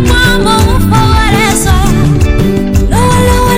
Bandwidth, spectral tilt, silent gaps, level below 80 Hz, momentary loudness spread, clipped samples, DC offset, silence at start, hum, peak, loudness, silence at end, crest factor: 16.5 kHz; -5 dB/octave; none; -14 dBFS; 3 LU; 0.7%; under 0.1%; 0 s; none; 0 dBFS; -8 LUFS; 0 s; 6 dB